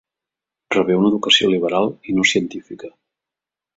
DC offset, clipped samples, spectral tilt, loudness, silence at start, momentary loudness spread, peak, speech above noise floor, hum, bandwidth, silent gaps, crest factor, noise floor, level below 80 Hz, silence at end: under 0.1%; under 0.1%; -4 dB/octave; -17 LUFS; 0.7 s; 18 LU; -2 dBFS; 70 dB; none; 8 kHz; none; 18 dB; -88 dBFS; -60 dBFS; 0.85 s